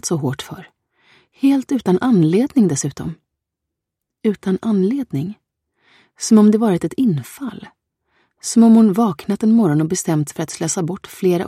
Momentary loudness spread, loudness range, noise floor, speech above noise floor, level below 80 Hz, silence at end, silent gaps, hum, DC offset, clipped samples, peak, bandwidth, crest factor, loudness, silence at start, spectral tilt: 17 LU; 5 LU; -81 dBFS; 65 dB; -58 dBFS; 0 s; none; none; under 0.1%; under 0.1%; -2 dBFS; 14 kHz; 16 dB; -17 LUFS; 0.05 s; -6 dB/octave